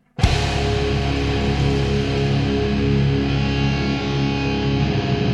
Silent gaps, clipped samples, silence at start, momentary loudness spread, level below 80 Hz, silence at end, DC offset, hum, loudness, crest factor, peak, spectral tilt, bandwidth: none; under 0.1%; 0.2 s; 2 LU; -28 dBFS; 0 s; under 0.1%; none; -20 LUFS; 16 dB; -2 dBFS; -6.5 dB/octave; 10.5 kHz